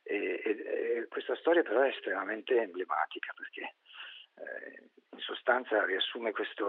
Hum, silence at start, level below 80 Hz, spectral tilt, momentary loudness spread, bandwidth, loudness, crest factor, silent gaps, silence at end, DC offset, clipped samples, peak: none; 0.05 s; under -90 dBFS; 1 dB/octave; 16 LU; 4.3 kHz; -33 LUFS; 22 dB; none; 0 s; under 0.1%; under 0.1%; -12 dBFS